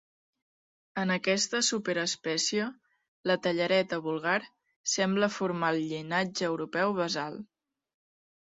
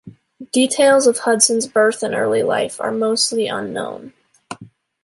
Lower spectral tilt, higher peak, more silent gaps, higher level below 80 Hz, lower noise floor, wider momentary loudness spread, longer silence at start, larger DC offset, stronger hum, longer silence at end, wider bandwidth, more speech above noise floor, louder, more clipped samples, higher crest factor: about the same, -3.5 dB/octave vs -2.5 dB/octave; second, -12 dBFS vs 0 dBFS; first, 3.08-3.24 s, 4.76-4.84 s vs none; second, -74 dBFS vs -64 dBFS; first, under -90 dBFS vs -42 dBFS; second, 7 LU vs 22 LU; first, 0.95 s vs 0.05 s; neither; neither; first, 1.05 s vs 0.4 s; second, 8.4 kHz vs 11.5 kHz; first, over 61 dB vs 25 dB; second, -29 LUFS vs -17 LUFS; neither; about the same, 18 dB vs 18 dB